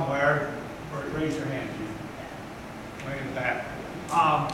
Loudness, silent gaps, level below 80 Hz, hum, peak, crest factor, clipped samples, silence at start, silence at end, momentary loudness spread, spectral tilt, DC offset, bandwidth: -30 LUFS; none; -52 dBFS; none; -10 dBFS; 18 dB; under 0.1%; 0 s; 0 s; 15 LU; -5.5 dB/octave; under 0.1%; 16 kHz